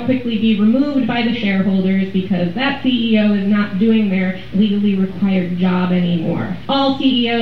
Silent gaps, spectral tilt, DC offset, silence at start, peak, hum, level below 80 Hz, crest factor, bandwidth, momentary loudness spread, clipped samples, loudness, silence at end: none; -8.5 dB/octave; 2%; 0 s; -4 dBFS; none; -46 dBFS; 12 dB; 5.6 kHz; 4 LU; under 0.1%; -16 LUFS; 0 s